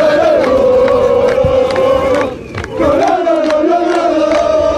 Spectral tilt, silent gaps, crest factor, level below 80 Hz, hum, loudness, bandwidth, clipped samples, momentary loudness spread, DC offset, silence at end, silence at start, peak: -6 dB/octave; none; 8 dB; -34 dBFS; none; -11 LUFS; 11 kHz; under 0.1%; 5 LU; under 0.1%; 0 s; 0 s; -2 dBFS